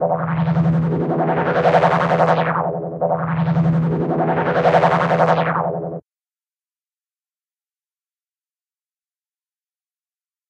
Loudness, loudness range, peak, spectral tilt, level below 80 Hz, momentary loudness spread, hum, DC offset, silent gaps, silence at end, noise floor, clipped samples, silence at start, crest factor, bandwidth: -18 LUFS; 6 LU; -2 dBFS; -8.5 dB/octave; -52 dBFS; 7 LU; none; under 0.1%; none; 4.5 s; under -90 dBFS; under 0.1%; 0 s; 18 dB; 6.8 kHz